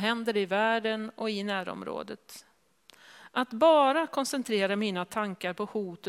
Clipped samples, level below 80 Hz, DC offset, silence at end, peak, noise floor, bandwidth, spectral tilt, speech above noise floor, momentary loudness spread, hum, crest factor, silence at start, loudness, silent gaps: under 0.1%; -76 dBFS; under 0.1%; 0 s; -10 dBFS; -61 dBFS; 15.5 kHz; -4.5 dB/octave; 32 dB; 15 LU; none; 18 dB; 0 s; -29 LUFS; none